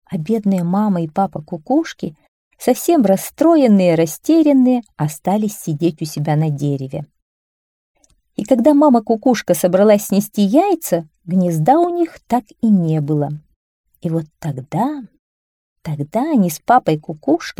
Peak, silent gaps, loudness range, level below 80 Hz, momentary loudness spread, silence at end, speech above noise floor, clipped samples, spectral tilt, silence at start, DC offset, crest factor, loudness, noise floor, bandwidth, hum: -2 dBFS; 2.28-2.51 s, 7.22-7.95 s, 13.56-13.84 s, 15.19-15.76 s; 7 LU; -58 dBFS; 13 LU; 0.1 s; over 75 dB; under 0.1%; -7 dB/octave; 0.1 s; under 0.1%; 14 dB; -16 LUFS; under -90 dBFS; 19 kHz; none